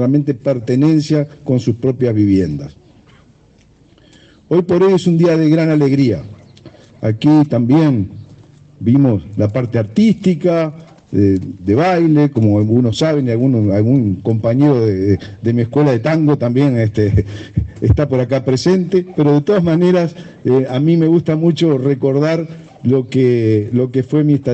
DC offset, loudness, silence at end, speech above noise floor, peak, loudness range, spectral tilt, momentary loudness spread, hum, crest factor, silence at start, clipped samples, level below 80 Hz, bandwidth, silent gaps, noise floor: under 0.1%; -14 LUFS; 0 s; 36 dB; 0 dBFS; 3 LU; -8.5 dB/octave; 6 LU; none; 14 dB; 0 s; under 0.1%; -40 dBFS; 8.4 kHz; none; -49 dBFS